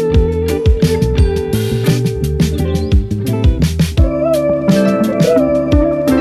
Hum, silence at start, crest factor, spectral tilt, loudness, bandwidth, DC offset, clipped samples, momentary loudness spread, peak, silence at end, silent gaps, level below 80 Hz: none; 0 s; 12 dB; -7 dB/octave; -14 LUFS; 14 kHz; under 0.1%; under 0.1%; 4 LU; 0 dBFS; 0 s; none; -18 dBFS